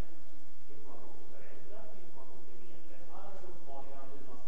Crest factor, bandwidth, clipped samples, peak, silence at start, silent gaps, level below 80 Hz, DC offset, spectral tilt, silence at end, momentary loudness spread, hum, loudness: 14 dB; 8.4 kHz; under 0.1%; -22 dBFS; 0 s; none; -64 dBFS; 7%; -7 dB/octave; 0 s; 9 LU; none; -55 LUFS